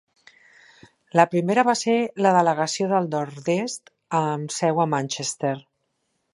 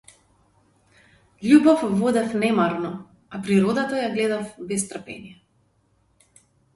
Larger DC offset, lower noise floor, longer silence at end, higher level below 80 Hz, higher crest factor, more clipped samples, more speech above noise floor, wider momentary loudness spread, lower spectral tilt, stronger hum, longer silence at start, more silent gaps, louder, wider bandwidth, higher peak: neither; first, -74 dBFS vs -65 dBFS; second, 0.75 s vs 1.4 s; second, -74 dBFS vs -62 dBFS; about the same, 22 dB vs 20 dB; neither; first, 52 dB vs 44 dB; second, 8 LU vs 20 LU; about the same, -5 dB/octave vs -5.5 dB/octave; neither; second, 1.15 s vs 1.4 s; neither; about the same, -22 LUFS vs -21 LUFS; about the same, 11.5 kHz vs 11.5 kHz; about the same, -2 dBFS vs -4 dBFS